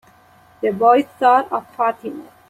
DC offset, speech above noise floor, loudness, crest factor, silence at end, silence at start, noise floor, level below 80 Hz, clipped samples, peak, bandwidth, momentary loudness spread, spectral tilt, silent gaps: under 0.1%; 33 dB; -17 LUFS; 16 dB; 0.25 s; 0.6 s; -50 dBFS; -66 dBFS; under 0.1%; -2 dBFS; 12.5 kHz; 13 LU; -6 dB/octave; none